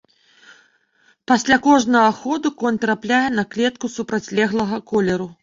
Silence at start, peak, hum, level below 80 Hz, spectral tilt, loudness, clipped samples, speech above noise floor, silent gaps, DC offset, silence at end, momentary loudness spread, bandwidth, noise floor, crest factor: 1.3 s; -2 dBFS; none; -56 dBFS; -4.5 dB/octave; -19 LUFS; under 0.1%; 41 dB; none; under 0.1%; 0.1 s; 8 LU; 7.6 kHz; -59 dBFS; 18 dB